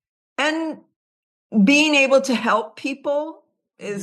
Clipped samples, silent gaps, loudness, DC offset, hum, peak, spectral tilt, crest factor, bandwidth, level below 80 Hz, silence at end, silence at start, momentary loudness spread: under 0.1%; 0.96-1.50 s; -19 LUFS; under 0.1%; none; -4 dBFS; -4 dB/octave; 16 dB; 12.5 kHz; -74 dBFS; 0 s; 0.4 s; 19 LU